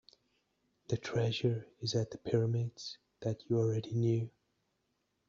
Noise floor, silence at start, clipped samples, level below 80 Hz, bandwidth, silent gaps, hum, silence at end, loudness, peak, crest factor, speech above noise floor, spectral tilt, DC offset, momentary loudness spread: -81 dBFS; 0.9 s; under 0.1%; -70 dBFS; 7.4 kHz; none; none; 1 s; -35 LUFS; -16 dBFS; 20 dB; 47 dB; -7 dB/octave; under 0.1%; 8 LU